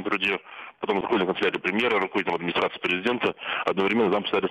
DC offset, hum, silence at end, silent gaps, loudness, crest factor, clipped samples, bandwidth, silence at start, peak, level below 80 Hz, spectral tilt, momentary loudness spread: under 0.1%; none; 0 s; none; -25 LUFS; 16 dB; under 0.1%; 10.5 kHz; 0 s; -10 dBFS; -62 dBFS; -6 dB/octave; 5 LU